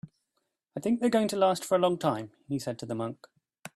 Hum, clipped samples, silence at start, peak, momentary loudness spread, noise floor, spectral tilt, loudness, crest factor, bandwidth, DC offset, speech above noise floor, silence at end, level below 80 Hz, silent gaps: none; under 0.1%; 0.05 s; -12 dBFS; 14 LU; -80 dBFS; -5.5 dB/octave; -29 LUFS; 18 dB; 13 kHz; under 0.1%; 52 dB; 0.05 s; -70 dBFS; none